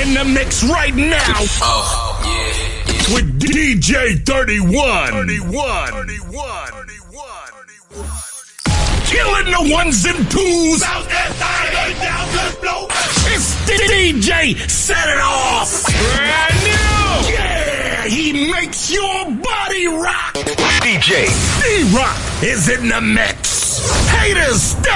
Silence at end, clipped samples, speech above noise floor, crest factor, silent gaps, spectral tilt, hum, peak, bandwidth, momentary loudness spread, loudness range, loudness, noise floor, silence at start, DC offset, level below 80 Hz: 0 s; under 0.1%; 24 dB; 14 dB; none; -3 dB/octave; none; -2 dBFS; 11.5 kHz; 8 LU; 5 LU; -14 LUFS; -38 dBFS; 0 s; under 0.1%; -24 dBFS